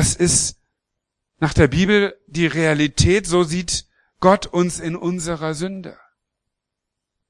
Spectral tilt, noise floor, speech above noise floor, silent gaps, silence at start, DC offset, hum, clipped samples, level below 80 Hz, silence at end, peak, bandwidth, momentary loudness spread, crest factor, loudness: -4.5 dB/octave; -82 dBFS; 63 dB; none; 0 s; under 0.1%; none; under 0.1%; -38 dBFS; 1.35 s; 0 dBFS; 12 kHz; 9 LU; 20 dB; -19 LUFS